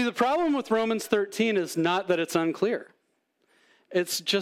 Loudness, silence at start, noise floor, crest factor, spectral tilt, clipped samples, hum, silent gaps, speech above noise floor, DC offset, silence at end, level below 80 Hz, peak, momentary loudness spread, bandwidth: -26 LUFS; 0 s; -73 dBFS; 18 dB; -4 dB/octave; under 0.1%; none; none; 47 dB; under 0.1%; 0 s; -70 dBFS; -8 dBFS; 4 LU; 16.5 kHz